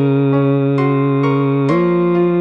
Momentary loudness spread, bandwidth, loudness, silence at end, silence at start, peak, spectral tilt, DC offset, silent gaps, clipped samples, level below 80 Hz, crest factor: 1 LU; 5.6 kHz; -14 LUFS; 0 s; 0 s; -2 dBFS; -10 dB/octave; 0.3%; none; under 0.1%; -60 dBFS; 10 dB